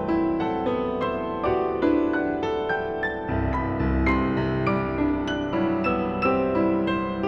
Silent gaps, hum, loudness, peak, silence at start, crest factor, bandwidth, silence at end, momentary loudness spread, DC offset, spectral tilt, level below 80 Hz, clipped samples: none; none; -24 LUFS; -10 dBFS; 0 s; 14 dB; 6.4 kHz; 0 s; 4 LU; under 0.1%; -8 dB/octave; -38 dBFS; under 0.1%